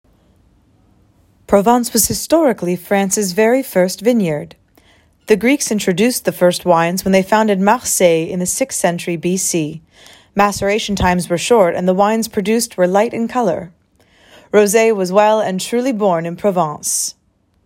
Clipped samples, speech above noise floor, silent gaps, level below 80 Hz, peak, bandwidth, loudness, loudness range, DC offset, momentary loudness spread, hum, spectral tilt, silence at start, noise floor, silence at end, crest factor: under 0.1%; 38 dB; none; -46 dBFS; 0 dBFS; 16.5 kHz; -15 LUFS; 2 LU; under 0.1%; 6 LU; none; -4 dB/octave; 1.5 s; -53 dBFS; 0.55 s; 16 dB